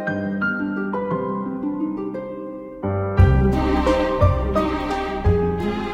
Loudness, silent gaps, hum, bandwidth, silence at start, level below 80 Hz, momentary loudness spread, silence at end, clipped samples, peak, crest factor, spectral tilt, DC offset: -21 LUFS; none; none; 8.8 kHz; 0 s; -28 dBFS; 11 LU; 0 s; under 0.1%; -2 dBFS; 18 dB; -8.5 dB/octave; under 0.1%